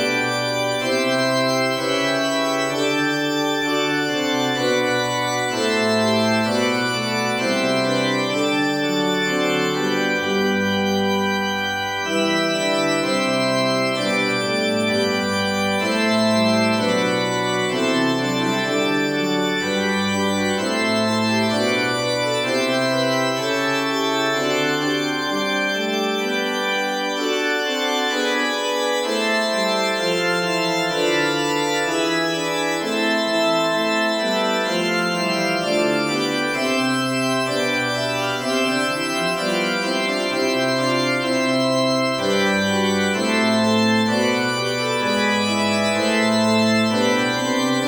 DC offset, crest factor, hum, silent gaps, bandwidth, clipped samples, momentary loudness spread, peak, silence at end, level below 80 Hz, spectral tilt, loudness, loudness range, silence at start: under 0.1%; 14 dB; none; none; over 20 kHz; under 0.1%; 3 LU; -6 dBFS; 0 s; -62 dBFS; -4 dB/octave; -20 LUFS; 2 LU; 0 s